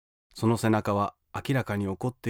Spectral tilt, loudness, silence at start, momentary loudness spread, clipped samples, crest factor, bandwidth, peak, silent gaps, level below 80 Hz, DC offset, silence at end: -6.5 dB/octave; -28 LUFS; 0.35 s; 8 LU; under 0.1%; 16 dB; 17.5 kHz; -12 dBFS; none; -60 dBFS; under 0.1%; 0 s